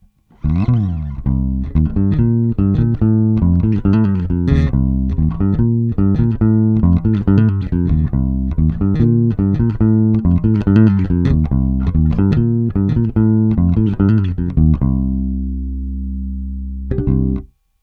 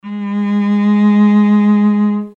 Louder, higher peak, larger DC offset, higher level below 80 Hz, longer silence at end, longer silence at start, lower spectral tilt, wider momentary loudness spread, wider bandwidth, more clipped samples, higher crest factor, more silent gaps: second, -16 LUFS vs -12 LUFS; first, 0 dBFS vs -4 dBFS; neither; first, -24 dBFS vs -68 dBFS; first, 0.35 s vs 0.05 s; first, 0.45 s vs 0.05 s; first, -11.5 dB/octave vs -9.5 dB/octave; about the same, 8 LU vs 7 LU; about the same, 4.7 kHz vs 4.4 kHz; neither; first, 14 dB vs 8 dB; neither